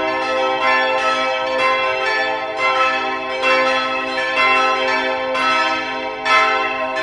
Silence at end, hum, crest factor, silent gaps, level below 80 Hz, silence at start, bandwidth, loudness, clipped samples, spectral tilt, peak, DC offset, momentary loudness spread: 0 s; none; 16 dB; none; -54 dBFS; 0 s; 11.5 kHz; -17 LUFS; under 0.1%; -2 dB/octave; -2 dBFS; under 0.1%; 6 LU